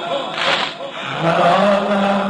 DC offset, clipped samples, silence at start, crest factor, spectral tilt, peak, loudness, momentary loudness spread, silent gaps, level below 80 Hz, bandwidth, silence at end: under 0.1%; under 0.1%; 0 s; 16 dB; -5 dB/octave; -2 dBFS; -17 LUFS; 10 LU; none; -56 dBFS; 10.5 kHz; 0 s